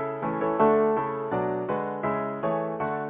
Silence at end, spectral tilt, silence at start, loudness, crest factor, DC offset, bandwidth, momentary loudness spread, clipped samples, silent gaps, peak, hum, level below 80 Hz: 0 s; -11 dB/octave; 0 s; -26 LUFS; 18 dB; under 0.1%; 3.8 kHz; 8 LU; under 0.1%; none; -8 dBFS; none; -60 dBFS